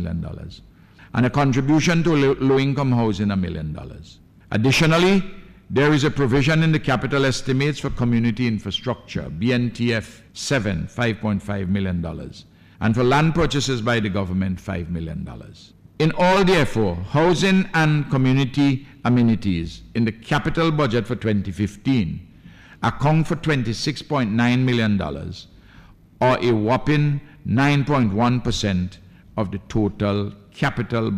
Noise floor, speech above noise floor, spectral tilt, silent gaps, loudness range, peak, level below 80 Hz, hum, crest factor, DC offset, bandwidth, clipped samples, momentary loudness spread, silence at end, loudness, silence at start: -47 dBFS; 27 dB; -6.5 dB/octave; none; 4 LU; -6 dBFS; -40 dBFS; none; 14 dB; under 0.1%; 14 kHz; under 0.1%; 11 LU; 0 s; -20 LUFS; 0 s